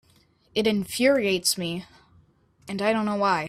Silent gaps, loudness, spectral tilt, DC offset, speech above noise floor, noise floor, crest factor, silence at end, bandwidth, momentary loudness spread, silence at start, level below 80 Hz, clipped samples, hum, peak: none; -24 LUFS; -3.5 dB/octave; under 0.1%; 37 dB; -61 dBFS; 18 dB; 0 s; 16 kHz; 10 LU; 0.55 s; -62 dBFS; under 0.1%; none; -8 dBFS